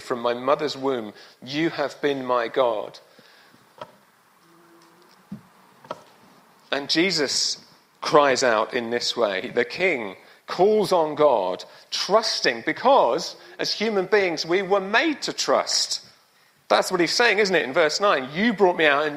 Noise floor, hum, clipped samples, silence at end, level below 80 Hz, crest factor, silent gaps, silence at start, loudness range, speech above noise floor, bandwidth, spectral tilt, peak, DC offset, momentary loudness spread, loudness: -59 dBFS; none; under 0.1%; 0 s; -70 dBFS; 20 dB; none; 0 s; 7 LU; 37 dB; 15.5 kHz; -3 dB/octave; -2 dBFS; under 0.1%; 15 LU; -22 LUFS